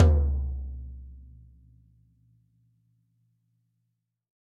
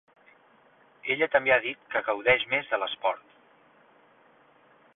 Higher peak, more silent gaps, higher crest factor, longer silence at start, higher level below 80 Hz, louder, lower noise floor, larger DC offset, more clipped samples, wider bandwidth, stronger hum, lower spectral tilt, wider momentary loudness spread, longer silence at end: about the same, -6 dBFS vs -8 dBFS; neither; about the same, 24 dB vs 22 dB; second, 0 s vs 1.05 s; first, -32 dBFS vs -68 dBFS; second, -29 LUFS vs -26 LUFS; first, -79 dBFS vs -60 dBFS; neither; neither; about the same, 3.7 kHz vs 4 kHz; neither; first, -9.5 dB/octave vs -7 dB/octave; first, 26 LU vs 8 LU; first, 3.25 s vs 1.75 s